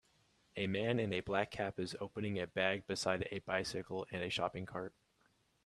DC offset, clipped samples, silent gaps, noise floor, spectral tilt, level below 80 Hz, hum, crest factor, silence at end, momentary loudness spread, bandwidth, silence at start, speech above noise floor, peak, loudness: under 0.1%; under 0.1%; none; -75 dBFS; -5 dB/octave; -68 dBFS; none; 22 dB; 0.75 s; 8 LU; 13 kHz; 0.55 s; 36 dB; -18 dBFS; -39 LUFS